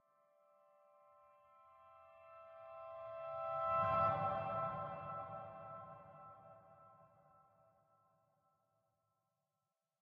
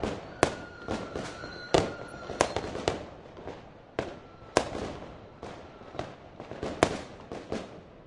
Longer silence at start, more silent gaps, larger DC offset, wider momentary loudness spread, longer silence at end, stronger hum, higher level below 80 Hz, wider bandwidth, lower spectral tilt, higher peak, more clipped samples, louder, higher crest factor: first, 1.55 s vs 0 s; neither; neither; first, 27 LU vs 16 LU; first, 2.95 s vs 0 s; neither; second, -76 dBFS vs -52 dBFS; second, 6 kHz vs 11.5 kHz; about the same, -5.5 dB/octave vs -4.5 dB/octave; second, -24 dBFS vs -4 dBFS; neither; second, -41 LUFS vs -33 LUFS; second, 22 dB vs 30 dB